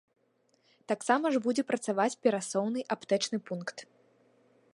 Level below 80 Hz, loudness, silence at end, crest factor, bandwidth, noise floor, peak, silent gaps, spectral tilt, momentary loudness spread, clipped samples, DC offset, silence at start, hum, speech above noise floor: -86 dBFS; -31 LUFS; 0.9 s; 22 dB; 11.5 kHz; -71 dBFS; -10 dBFS; none; -4 dB/octave; 11 LU; under 0.1%; under 0.1%; 0.9 s; none; 41 dB